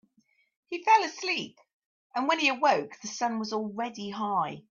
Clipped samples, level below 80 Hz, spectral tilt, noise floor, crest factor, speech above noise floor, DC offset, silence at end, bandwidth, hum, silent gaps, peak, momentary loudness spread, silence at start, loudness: under 0.1%; -80 dBFS; -3 dB/octave; -69 dBFS; 20 dB; 41 dB; under 0.1%; 0.1 s; 7.4 kHz; none; 1.74-1.80 s, 1.86-2.10 s; -10 dBFS; 12 LU; 0.7 s; -28 LUFS